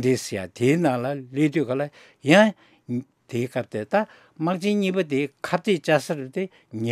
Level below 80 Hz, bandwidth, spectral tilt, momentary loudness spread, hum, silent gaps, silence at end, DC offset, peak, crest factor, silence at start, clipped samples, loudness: -72 dBFS; 15 kHz; -6 dB/octave; 13 LU; none; none; 0 s; under 0.1%; -2 dBFS; 22 dB; 0 s; under 0.1%; -24 LUFS